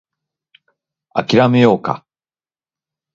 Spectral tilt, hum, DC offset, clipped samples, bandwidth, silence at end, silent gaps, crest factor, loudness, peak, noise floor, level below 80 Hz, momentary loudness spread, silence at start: -7 dB/octave; none; under 0.1%; under 0.1%; 7.4 kHz; 1.15 s; none; 18 dB; -14 LUFS; 0 dBFS; under -90 dBFS; -58 dBFS; 13 LU; 1.15 s